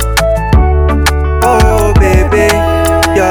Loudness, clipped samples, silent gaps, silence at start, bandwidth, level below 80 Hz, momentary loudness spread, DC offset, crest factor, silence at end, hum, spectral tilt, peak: -9 LUFS; under 0.1%; none; 0 s; 20 kHz; -12 dBFS; 3 LU; under 0.1%; 8 dB; 0 s; none; -5.5 dB/octave; 0 dBFS